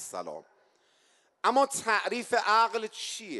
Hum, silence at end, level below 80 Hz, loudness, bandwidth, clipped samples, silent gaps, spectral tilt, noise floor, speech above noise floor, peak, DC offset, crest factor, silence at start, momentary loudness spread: none; 0 s; -84 dBFS; -27 LUFS; 12 kHz; under 0.1%; none; -1.5 dB/octave; -67 dBFS; 39 dB; -12 dBFS; under 0.1%; 18 dB; 0 s; 15 LU